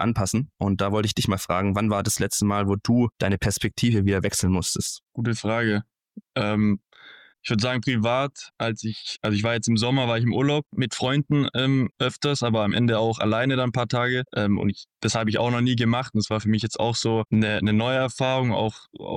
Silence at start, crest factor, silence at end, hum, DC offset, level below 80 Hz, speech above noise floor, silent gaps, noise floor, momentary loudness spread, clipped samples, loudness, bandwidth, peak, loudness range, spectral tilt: 0 s; 12 dB; 0 s; none; under 0.1%; -50 dBFS; 27 dB; 5.03-5.07 s; -50 dBFS; 6 LU; under 0.1%; -24 LUFS; 16 kHz; -12 dBFS; 3 LU; -5 dB/octave